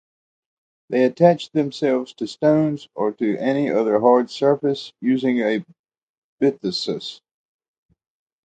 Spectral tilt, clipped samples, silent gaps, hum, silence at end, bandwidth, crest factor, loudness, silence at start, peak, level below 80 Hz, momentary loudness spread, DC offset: -6.5 dB/octave; under 0.1%; 5.79-5.84 s, 6.03-6.37 s; none; 1.3 s; 9 kHz; 20 dB; -20 LUFS; 0.9 s; -2 dBFS; -68 dBFS; 9 LU; under 0.1%